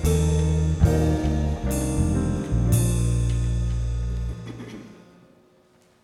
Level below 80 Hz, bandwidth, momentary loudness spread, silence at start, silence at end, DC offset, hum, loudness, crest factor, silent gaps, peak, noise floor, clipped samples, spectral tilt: -28 dBFS; 15.5 kHz; 13 LU; 0 s; 1.1 s; under 0.1%; none; -24 LUFS; 18 dB; none; -6 dBFS; -58 dBFS; under 0.1%; -7 dB/octave